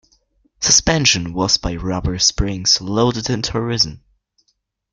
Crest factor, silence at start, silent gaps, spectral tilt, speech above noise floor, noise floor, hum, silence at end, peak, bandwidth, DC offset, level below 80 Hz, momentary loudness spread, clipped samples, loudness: 20 dB; 0.6 s; none; -2.5 dB/octave; 50 dB; -68 dBFS; none; 0.95 s; 0 dBFS; 11 kHz; under 0.1%; -34 dBFS; 8 LU; under 0.1%; -16 LUFS